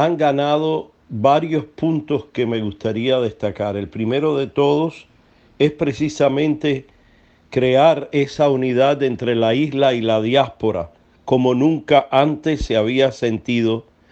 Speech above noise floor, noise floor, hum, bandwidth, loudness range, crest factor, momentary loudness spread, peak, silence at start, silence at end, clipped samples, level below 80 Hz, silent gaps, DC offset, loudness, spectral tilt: 35 dB; -53 dBFS; none; 8.4 kHz; 3 LU; 18 dB; 8 LU; 0 dBFS; 0 s; 0.3 s; under 0.1%; -44 dBFS; none; under 0.1%; -18 LUFS; -6.5 dB/octave